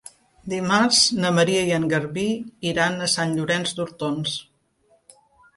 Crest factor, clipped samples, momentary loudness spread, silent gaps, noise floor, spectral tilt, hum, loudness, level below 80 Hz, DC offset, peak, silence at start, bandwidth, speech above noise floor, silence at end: 18 dB; under 0.1%; 11 LU; none; -63 dBFS; -3.5 dB/octave; none; -21 LUFS; -58 dBFS; under 0.1%; -6 dBFS; 0.45 s; 12 kHz; 41 dB; 1.15 s